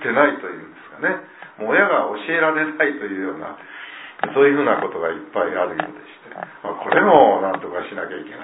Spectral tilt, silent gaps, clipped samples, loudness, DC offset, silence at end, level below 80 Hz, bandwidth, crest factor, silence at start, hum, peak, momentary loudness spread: -9 dB/octave; none; under 0.1%; -19 LUFS; under 0.1%; 0 s; -64 dBFS; 4 kHz; 20 dB; 0 s; none; 0 dBFS; 20 LU